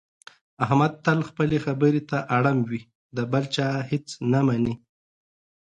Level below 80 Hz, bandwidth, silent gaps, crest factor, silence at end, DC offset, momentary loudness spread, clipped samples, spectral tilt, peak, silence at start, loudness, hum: -58 dBFS; 9.2 kHz; 2.95-3.10 s; 18 dB; 1 s; under 0.1%; 9 LU; under 0.1%; -7 dB/octave; -6 dBFS; 0.6 s; -24 LUFS; none